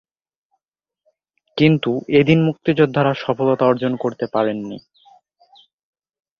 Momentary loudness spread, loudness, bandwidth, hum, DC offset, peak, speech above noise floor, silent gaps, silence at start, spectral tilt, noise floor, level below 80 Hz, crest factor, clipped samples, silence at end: 11 LU; -18 LUFS; 6.8 kHz; none; under 0.1%; -2 dBFS; 66 dB; none; 1.55 s; -8.5 dB/octave; -83 dBFS; -56 dBFS; 18 dB; under 0.1%; 1.6 s